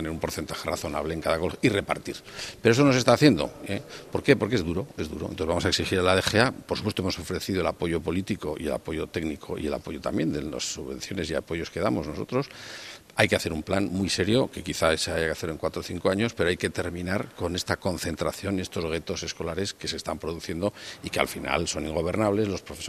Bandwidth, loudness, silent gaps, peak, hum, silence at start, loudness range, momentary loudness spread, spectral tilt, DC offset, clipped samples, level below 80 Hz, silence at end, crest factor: 15.5 kHz; -27 LUFS; none; -2 dBFS; none; 0 s; 6 LU; 10 LU; -4.5 dB/octave; under 0.1%; under 0.1%; -48 dBFS; 0 s; 26 dB